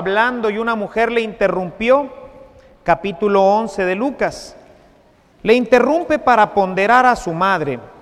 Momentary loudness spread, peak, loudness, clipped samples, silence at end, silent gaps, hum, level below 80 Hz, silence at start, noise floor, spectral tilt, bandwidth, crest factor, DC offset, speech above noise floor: 9 LU; 0 dBFS; -16 LUFS; under 0.1%; 0.15 s; none; none; -46 dBFS; 0 s; -51 dBFS; -5.5 dB/octave; 13.5 kHz; 16 dB; under 0.1%; 35 dB